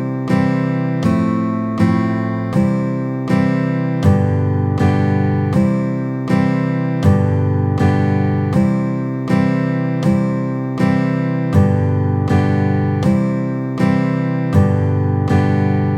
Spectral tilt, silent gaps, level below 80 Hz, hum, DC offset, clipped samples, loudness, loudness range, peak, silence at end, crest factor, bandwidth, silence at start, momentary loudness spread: -9 dB/octave; none; -42 dBFS; none; under 0.1%; under 0.1%; -16 LUFS; 1 LU; 0 dBFS; 0 s; 14 dB; 9.6 kHz; 0 s; 4 LU